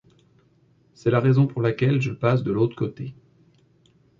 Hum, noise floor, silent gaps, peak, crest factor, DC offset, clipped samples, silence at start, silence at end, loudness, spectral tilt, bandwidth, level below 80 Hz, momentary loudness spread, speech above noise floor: none; -60 dBFS; none; -8 dBFS; 16 dB; under 0.1%; under 0.1%; 1.05 s; 1.1 s; -22 LUFS; -9 dB/octave; 7.4 kHz; -58 dBFS; 11 LU; 39 dB